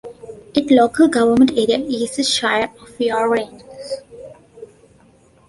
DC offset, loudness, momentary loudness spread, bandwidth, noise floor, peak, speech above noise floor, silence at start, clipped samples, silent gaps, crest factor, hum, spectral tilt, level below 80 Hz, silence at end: under 0.1%; -16 LUFS; 17 LU; 11.5 kHz; -51 dBFS; -2 dBFS; 35 dB; 0.05 s; under 0.1%; none; 18 dB; none; -3.5 dB/octave; -54 dBFS; 0.85 s